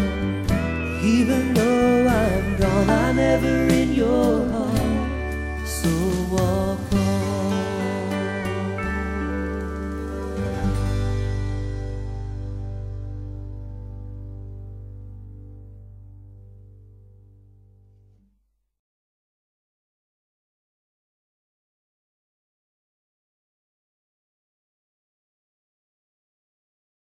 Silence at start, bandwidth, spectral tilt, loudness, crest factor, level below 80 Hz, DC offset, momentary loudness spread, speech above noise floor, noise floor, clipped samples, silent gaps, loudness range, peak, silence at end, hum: 0 s; 16 kHz; -6.5 dB/octave; -23 LUFS; 20 dB; -34 dBFS; under 0.1%; 18 LU; 51 dB; -69 dBFS; under 0.1%; none; 20 LU; -4 dBFS; 10.3 s; none